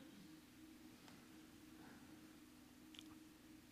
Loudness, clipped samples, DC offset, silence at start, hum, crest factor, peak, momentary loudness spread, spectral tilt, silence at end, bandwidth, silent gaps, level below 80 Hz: -62 LUFS; under 0.1%; under 0.1%; 0 s; none; 24 dB; -38 dBFS; 4 LU; -4 dB/octave; 0 s; 15.5 kHz; none; -80 dBFS